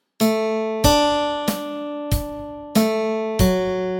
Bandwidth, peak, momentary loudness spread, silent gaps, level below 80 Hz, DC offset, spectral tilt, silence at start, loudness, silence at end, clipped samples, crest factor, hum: 17 kHz; -2 dBFS; 11 LU; none; -34 dBFS; under 0.1%; -5 dB/octave; 0.2 s; -21 LUFS; 0 s; under 0.1%; 20 dB; none